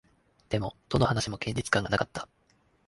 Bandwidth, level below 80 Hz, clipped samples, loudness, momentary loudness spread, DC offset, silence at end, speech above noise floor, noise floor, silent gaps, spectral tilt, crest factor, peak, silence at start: 11.5 kHz; -50 dBFS; under 0.1%; -29 LUFS; 9 LU; under 0.1%; 0.65 s; 38 dB; -67 dBFS; none; -5 dB/octave; 22 dB; -8 dBFS; 0.5 s